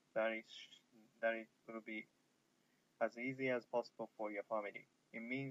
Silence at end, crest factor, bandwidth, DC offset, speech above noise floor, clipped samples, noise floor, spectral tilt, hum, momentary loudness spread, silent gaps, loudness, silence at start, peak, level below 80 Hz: 0 s; 20 dB; 8 kHz; under 0.1%; 35 dB; under 0.1%; -79 dBFS; -6 dB/octave; none; 14 LU; none; -44 LUFS; 0.15 s; -26 dBFS; under -90 dBFS